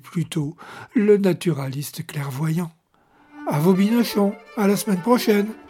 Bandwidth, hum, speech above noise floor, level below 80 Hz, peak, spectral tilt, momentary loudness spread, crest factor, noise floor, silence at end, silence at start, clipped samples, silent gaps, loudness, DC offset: 17 kHz; none; 37 dB; -64 dBFS; -4 dBFS; -6.5 dB/octave; 12 LU; 18 dB; -58 dBFS; 0 s; 0.05 s; under 0.1%; none; -21 LUFS; under 0.1%